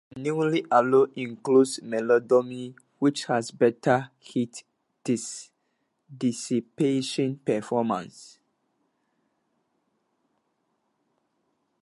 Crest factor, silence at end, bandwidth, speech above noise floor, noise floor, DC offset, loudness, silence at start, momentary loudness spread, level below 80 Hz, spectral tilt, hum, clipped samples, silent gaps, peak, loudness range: 20 dB; 3.6 s; 11.5 kHz; 50 dB; -75 dBFS; under 0.1%; -25 LUFS; 0.15 s; 14 LU; -74 dBFS; -5.5 dB/octave; none; under 0.1%; none; -6 dBFS; 8 LU